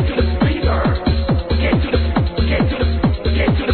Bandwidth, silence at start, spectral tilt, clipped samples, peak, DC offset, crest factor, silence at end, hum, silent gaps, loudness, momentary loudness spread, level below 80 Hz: 4.5 kHz; 0 s; -10.5 dB/octave; under 0.1%; -4 dBFS; 0.3%; 12 dB; 0 s; none; none; -17 LUFS; 2 LU; -20 dBFS